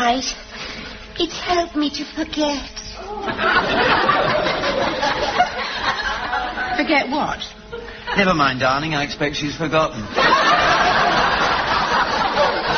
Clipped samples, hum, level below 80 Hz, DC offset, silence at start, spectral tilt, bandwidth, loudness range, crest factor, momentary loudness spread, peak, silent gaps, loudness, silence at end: under 0.1%; none; -40 dBFS; under 0.1%; 0 s; -1.5 dB/octave; 6.6 kHz; 4 LU; 16 dB; 14 LU; -2 dBFS; none; -18 LUFS; 0 s